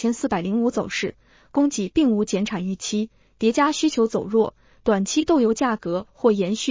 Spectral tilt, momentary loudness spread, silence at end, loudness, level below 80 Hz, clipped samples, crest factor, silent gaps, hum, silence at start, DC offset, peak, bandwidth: -5 dB/octave; 8 LU; 0 s; -22 LUFS; -52 dBFS; under 0.1%; 16 dB; none; none; 0 s; under 0.1%; -6 dBFS; 7.8 kHz